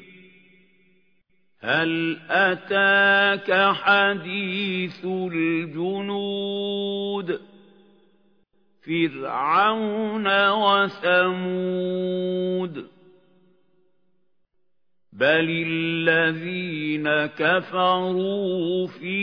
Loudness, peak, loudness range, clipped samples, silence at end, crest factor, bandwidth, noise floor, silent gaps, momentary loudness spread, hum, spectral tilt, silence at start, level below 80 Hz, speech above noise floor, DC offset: -22 LUFS; -4 dBFS; 9 LU; under 0.1%; 0 s; 20 dB; 5.4 kHz; -80 dBFS; none; 9 LU; none; -7.5 dB/octave; 1.65 s; -74 dBFS; 58 dB; under 0.1%